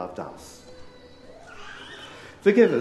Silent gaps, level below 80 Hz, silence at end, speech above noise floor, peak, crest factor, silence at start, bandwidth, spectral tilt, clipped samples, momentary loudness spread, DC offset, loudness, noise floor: none; -58 dBFS; 0 s; 25 dB; -6 dBFS; 20 dB; 0 s; 12 kHz; -6 dB/octave; under 0.1%; 28 LU; under 0.1%; -22 LUFS; -47 dBFS